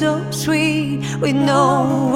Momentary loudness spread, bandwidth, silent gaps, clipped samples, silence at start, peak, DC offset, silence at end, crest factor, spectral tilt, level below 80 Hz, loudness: 6 LU; 16.5 kHz; none; under 0.1%; 0 s; -2 dBFS; under 0.1%; 0 s; 14 dB; -5.5 dB/octave; -50 dBFS; -17 LUFS